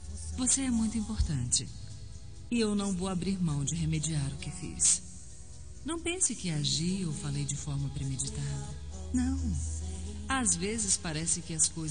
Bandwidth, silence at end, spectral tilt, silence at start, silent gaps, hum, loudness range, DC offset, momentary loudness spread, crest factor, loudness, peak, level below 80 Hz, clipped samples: 10 kHz; 0 s; -3.5 dB/octave; 0 s; none; none; 3 LU; 0.4%; 16 LU; 20 dB; -31 LUFS; -12 dBFS; -44 dBFS; under 0.1%